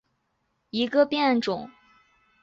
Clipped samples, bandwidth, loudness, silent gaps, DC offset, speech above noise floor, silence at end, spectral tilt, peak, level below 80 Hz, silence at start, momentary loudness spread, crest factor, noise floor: under 0.1%; 7.8 kHz; -25 LUFS; none; under 0.1%; 51 dB; 0.7 s; -5.5 dB/octave; -10 dBFS; -68 dBFS; 0.75 s; 12 LU; 18 dB; -74 dBFS